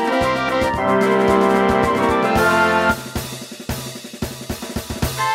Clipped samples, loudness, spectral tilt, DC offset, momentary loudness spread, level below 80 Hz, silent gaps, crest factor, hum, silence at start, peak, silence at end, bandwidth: under 0.1%; -18 LUFS; -5 dB/octave; under 0.1%; 14 LU; -36 dBFS; none; 16 dB; none; 0 s; -2 dBFS; 0 s; 16 kHz